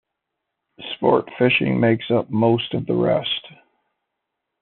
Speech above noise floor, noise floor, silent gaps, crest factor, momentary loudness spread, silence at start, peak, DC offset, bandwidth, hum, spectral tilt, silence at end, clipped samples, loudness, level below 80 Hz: 61 dB; -80 dBFS; none; 20 dB; 8 LU; 0.8 s; -2 dBFS; under 0.1%; 4.3 kHz; none; -4.5 dB/octave; 1.1 s; under 0.1%; -20 LUFS; -60 dBFS